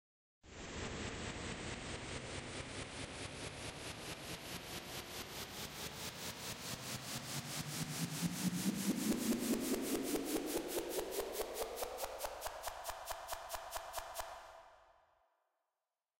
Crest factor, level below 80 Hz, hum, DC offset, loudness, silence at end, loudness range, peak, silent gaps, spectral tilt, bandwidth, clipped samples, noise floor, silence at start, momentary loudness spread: 18 dB; -60 dBFS; none; under 0.1%; -42 LUFS; 1.25 s; 7 LU; -24 dBFS; none; -3.5 dB/octave; 16 kHz; under 0.1%; under -90 dBFS; 0.45 s; 8 LU